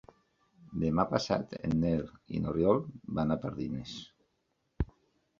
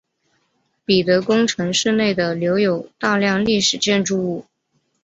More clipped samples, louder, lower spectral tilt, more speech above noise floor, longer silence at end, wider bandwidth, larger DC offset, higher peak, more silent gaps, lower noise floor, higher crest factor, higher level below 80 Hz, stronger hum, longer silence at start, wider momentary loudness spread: neither; second, -33 LUFS vs -18 LUFS; first, -7.5 dB/octave vs -4 dB/octave; about the same, 47 dB vs 50 dB; about the same, 0.55 s vs 0.6 s; second, 7.4 kHz vs 8.2 kHz; neither; second, -12 dBFS vs -4 dBFS; neither; first, -78 dBFS vs -68 dBFS; first, 22 dB vs 16 dB; first, -50 dBFS vs -56 dBFS; neither; second, 0.65 s vs 0.9 s; first, 11 LU vs 6 LU